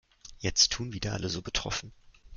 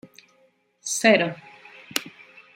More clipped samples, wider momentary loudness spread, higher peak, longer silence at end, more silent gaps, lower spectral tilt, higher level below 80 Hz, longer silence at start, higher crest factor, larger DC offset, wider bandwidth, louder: neither; second, 12 LU vs 22 LU; second, -8 dBFS vs -2 dBFS; second, 0 s vs 0.45 s; neither; about the same, -2 dB/octave vs -3 dB/octave; first, -48 dBFS vs -74 dBFS; second, 0.25 s vs 0.85 s; about the same, 24 dB vs 26 dB; neither; second, 11 kHz vs 16 kHz; second, -29 LUFS vs -22 LUFS